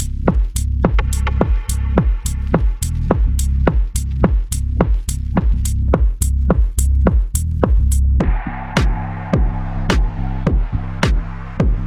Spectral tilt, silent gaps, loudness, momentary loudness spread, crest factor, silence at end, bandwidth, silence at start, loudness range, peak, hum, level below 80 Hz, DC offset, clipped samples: -6 dB/octave; none; -18 LUFS; 5 LU; 16 dB; 0 s; 14 kHz; 0 s; 2 LU; 0 dBFS; none; -18 dBFS; under 0.1%; under 0.1%